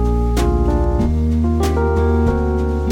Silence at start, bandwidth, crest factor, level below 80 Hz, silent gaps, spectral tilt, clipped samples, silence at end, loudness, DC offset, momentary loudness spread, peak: 0 s; 13.5 kHz; 10 dB; -18 dBFS; none; -8 dB/octave; under 0.1%; 0 s; -17 LUFS; under 0.1%; 2 LU; -4 dBFS